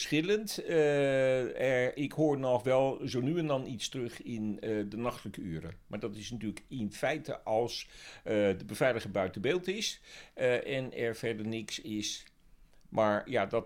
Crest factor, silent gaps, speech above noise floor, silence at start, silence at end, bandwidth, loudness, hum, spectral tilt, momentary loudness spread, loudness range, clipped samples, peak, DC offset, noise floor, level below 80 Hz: 18 dB; none; 27 dB; 0 s; 0 s; 16.5 kHz; -33 LUFS; none; -5 dB/octave; 12 LU; 7 LU; under 0.1%; -16 dBFS; under 0.1%; -59 dBFS; -62 dBFS